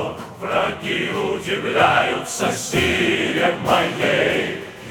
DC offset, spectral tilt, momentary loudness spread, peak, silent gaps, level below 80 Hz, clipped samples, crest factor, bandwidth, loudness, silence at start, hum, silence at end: under 0.1%; -3.5 dB/octave; 7 LU; -2 dBFS; none; -50 dBFS; under 0.1%; 18 dB; 17.5 kHz; -19 LUFS; 0 s; none; 0 s